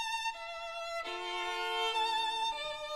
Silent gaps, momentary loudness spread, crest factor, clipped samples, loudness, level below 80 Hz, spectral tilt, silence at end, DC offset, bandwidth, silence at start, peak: none; 8 LU; 14 dB; under 0.1%; -35 LUFS; -66 dBFS; 0 dB/octave; 0 s; 0.1%; 16 kHz; 0 s; -22 dBFS